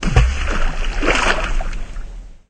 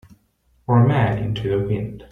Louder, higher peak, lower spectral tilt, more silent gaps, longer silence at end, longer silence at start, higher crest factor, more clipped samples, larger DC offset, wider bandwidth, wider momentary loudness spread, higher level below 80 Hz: about the same, -19 LUFS vs -20 LUFS; first, 0 dBFS vs -4 dBFS; second, -4.5 dB/octave vs -9.5 dB/octave; neither; about the same, 0.15 s vs 0.1 s; second, 0 s vs 0.7 s; about the same, 16 dB vs 16 dB; neither; neither; first, 9.2 kHz vs 4 kHz; first, 18 LU vs 10 LU; first, -18 dBFS vs -44 dBFS